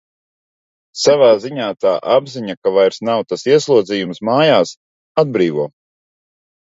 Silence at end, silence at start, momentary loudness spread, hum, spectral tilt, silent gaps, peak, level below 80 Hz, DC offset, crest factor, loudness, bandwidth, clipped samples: 1 s; 0.95 s; 11 LU; none; -5 dB/octave; 2.57-2.62 s, 4.77-5.15 s; 0 dBFS; -64 dBFS; under 0.1%; 16 dB; -15 LUFS; 7.8 kHz; under 0.1%